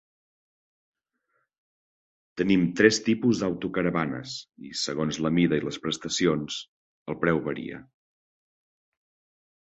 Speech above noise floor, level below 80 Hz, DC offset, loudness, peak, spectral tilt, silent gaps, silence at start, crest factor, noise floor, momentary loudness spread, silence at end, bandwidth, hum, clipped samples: 50 dB; -60 dBFS; under 0.1%; -26 LUFS; -4 dBFS; -5 dB/octave; 6.68-7.06 s; 2.35 s; 24 dB; -76 dBFS; 17 LU; 1.8 s; 8.2 kHz; none; under 0.1%